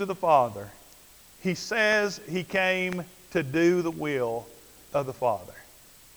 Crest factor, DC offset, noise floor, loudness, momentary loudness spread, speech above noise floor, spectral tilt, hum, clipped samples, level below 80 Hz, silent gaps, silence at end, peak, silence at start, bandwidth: 20 dB; under 0.1%; -53 dBFS; -27 LUFS; 13 LU; 27 dB; -5 dB/octave; none; under 0.1%; -62 dBFS; none; 0.55 s; -8 dBFS; 0 s; over 20 kHz